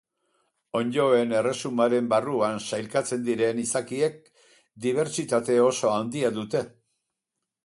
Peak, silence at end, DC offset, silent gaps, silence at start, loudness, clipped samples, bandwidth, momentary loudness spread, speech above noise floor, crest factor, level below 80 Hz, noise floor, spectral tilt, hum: -8 dBFS; 0.95 s; under 0.1%; none; 0.75 s; -25 LUFS; under 0.1%; 11.5 kHz; 8 LU; 60 dB; 18 dB; -70 dBFS; -85 dBFS; -4.5 dB/octave; none